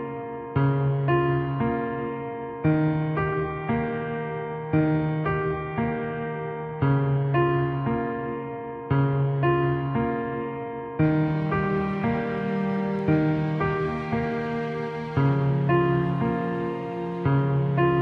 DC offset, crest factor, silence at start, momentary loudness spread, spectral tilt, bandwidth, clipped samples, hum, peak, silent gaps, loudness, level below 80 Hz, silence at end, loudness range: under 0.1%; 14 dB; 0 s; 8 LU; -10 dB/octave; 4.9 kHz; under 0.1%; none; -10 dBFS; none; -25 LUFS; -48 dBFS; 0 s; 2 LU